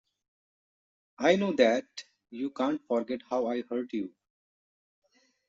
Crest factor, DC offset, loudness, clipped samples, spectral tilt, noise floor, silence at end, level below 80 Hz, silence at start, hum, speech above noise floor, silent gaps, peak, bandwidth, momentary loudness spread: 24 dB; under 0.1%; -29 LUFS; under 0.1%; -4 dB/octave; under -90 dBFS; 1.4 s; -76 dBFS; 1.2 s; none; over 61 dB; none; -8 dBFS; 7.8 kHz; 17 LU